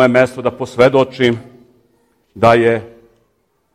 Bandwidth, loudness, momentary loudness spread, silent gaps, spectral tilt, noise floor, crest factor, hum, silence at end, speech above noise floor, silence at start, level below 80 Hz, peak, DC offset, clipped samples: 13 kHz; -14 LUFS; 10 LU; none; -6.5 dB/octave; -63 dBFS; 16 dB; none; 0.85 s; 50 dB; 0 s; -50 dBFS; 0 dBFS; under 0.1%; under 0.1%